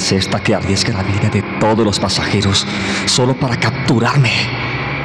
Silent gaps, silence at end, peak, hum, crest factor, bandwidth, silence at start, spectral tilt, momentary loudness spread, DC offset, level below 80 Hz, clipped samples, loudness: none; 0 s; -2 dBFS; none; 12 dB; 12.5 kHz; 0 s; -4.5 dB/octave; 4 LU; under 0.1%; -42 dBFS; under 0.1%; -15 LUFS